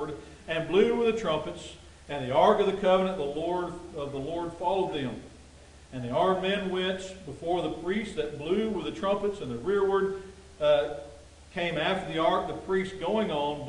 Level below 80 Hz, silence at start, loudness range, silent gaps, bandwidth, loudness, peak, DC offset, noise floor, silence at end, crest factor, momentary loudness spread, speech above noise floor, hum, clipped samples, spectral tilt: -54 dBFS; 0 s; 4 LU; none; 10.5 kHz; -29 LUFS; -10 dBFS; under 0.1%; -51 dBFS; 0 s; 20 dB; 14 LU; 23 dB; none; under 0.1%; -6 dB/octave